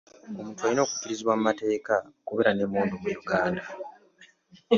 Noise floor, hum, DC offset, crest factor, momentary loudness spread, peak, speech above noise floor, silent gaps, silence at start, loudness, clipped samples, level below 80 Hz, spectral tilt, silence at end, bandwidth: -58 dBFS; none; under 0.1%; 20 dB; 14 LU; -8 dBFS; 31 dB; none; 0.25 s; -27 LUFS; under 0.1%; -64 dBFS; -4.5 dB/octave; 0 s; 7.6 kHz